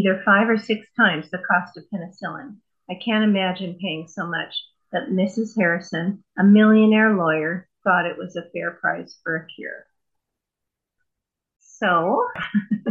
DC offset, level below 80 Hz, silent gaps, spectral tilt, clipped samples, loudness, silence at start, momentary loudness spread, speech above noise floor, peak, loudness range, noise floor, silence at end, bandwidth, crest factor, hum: under 0.1%; -72 dBFS; none; -7 dB/octave; under 0.1%; -21 LUFS; 0 s; 17 LU; 63 dB; -4 dBFS; 10 LU; -84 dBFS; 0 s; 7.4 kHz; 18 dB; none